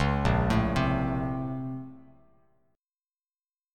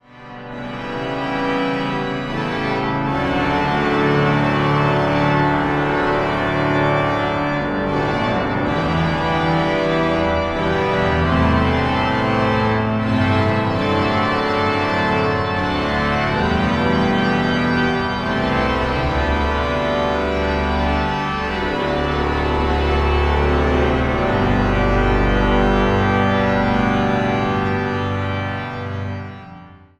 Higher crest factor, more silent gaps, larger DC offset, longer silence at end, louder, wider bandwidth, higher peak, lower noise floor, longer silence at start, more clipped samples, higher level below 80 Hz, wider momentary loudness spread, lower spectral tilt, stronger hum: about the same, 18 dB vs 16 dB; neither; neither; first, 1.75 s vs 0.25 s; second, -28 LUFS vs -18 LUFS; first, 12.5 kHz vs 10.5 kHz; second, -12 dBFS vs -2 dBFS; first, under -90 dBFS vs -40 dBFS; second, 0 s vs 0.15 s; neither; second, -38 dBFS vs -28 dBFS; first, 13 LU vs 5 LU; about the same, -7.5 dB/octave vs -7 dB/octave; neither